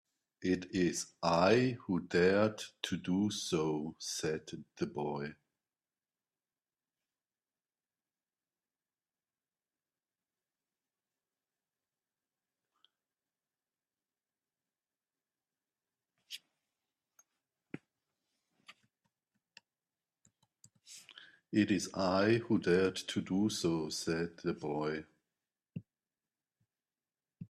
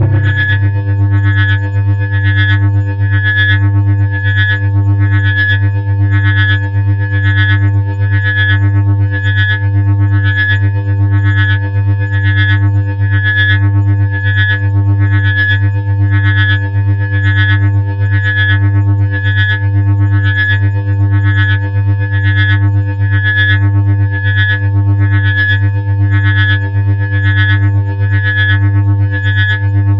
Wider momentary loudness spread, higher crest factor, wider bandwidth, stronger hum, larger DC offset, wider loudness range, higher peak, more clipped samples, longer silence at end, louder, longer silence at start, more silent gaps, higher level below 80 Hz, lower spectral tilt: first, 21 LU vs 3 LU; first, 24 dB vs 8 dB; first, 13.5 kHz vs 4.1 kHz; neither; second, under 0.1% vs 2%; first, 24 LU vs 1 LU; second, -16 dBFS vs 0 dBFS; neither; about the same, 0.05 s vs 0 s; second, -34 LUFS vs -11 LUFS; first, 0.4 s vs 0 s; neither; second, -74 dBFS vs -42 dBFS; second, -5 dB/octave vs -8.5 dB/octave